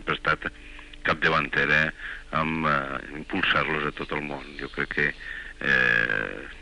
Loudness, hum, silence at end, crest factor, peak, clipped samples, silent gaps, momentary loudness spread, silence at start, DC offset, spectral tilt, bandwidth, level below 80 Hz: -25 LUFS; none; 0 s; 18 dB; -10 dBFS; under 0.1%; none; 14 LU; 0 s; under 0.1%; -5 dB/octave; 11 kHz; -46 dBFS